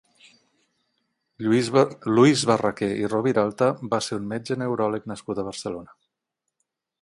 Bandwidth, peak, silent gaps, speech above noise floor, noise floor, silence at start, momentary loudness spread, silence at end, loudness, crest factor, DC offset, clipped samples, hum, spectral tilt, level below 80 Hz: 11.5 kHz; -4 dBFS; none; 60 dB; -82 dBFS; 1.4 s; 13 LU; 1.15 s; -23 LUFS; 20 dB; under 0.1%; under 0.1%; none; -5.5 dB/octave; -62 dBFS